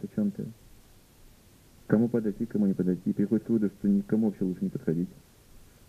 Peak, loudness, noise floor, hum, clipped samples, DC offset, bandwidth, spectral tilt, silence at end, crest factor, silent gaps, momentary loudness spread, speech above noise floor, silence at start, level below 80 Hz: -8 dBFS; -28 LUFS; -56 dBFS; none; under 0.1%; under 0.1%; 14.5 kHz; -9.5 dB/octave; 0.3 s; 20 dB; none; 6 LU; 29 dB; 0 s; -58 dBFS